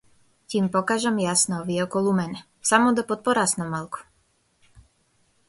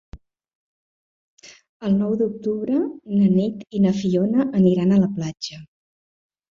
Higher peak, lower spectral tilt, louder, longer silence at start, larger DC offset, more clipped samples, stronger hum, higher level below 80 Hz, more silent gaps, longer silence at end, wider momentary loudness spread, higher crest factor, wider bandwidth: about the same, -4 dBFS vs -6 dBFS; second, -4 dB/octave vs -8 dB/octave; about the same, -23 LUFS vs -21 LUFS; first, 0.5 s vs 0.15 s; neither; neither; neither; second, -62 dBFS vs -56 dBFS; second, none vs 0.55-1.37 s, 1.69-1.80 s; second, 0.7 s vs 0.85 s; about the same, 11 LU vs 10 LU; first, 22 dB vs 16 dB; first, 12 kHz vs 7.2 kHz